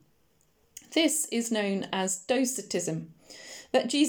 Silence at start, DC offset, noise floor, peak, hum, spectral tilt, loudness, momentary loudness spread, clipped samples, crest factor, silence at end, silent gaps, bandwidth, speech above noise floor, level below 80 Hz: 0.9 s; under 0.1%; -68 dBFS; -12 dBFS; none; -3 dB/octave; -28 LUFS; 20 LU; under 0.1%; 18 dB; 0 s; none; over 20 kHz; 40 dB; -74 dBFS